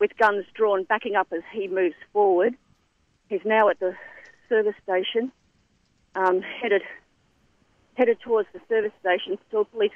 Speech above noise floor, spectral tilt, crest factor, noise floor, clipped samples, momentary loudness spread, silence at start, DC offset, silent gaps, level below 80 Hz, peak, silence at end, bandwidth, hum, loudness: 43 dB; -6 dB/octave; 18 dB; -67 dBFS; under 0.1%; 11 LU; 0 s; under 0.1%; none; -70 dBFS; -8 dBFS; 0.05 s; 6.4 kHz; none; -24 LUFS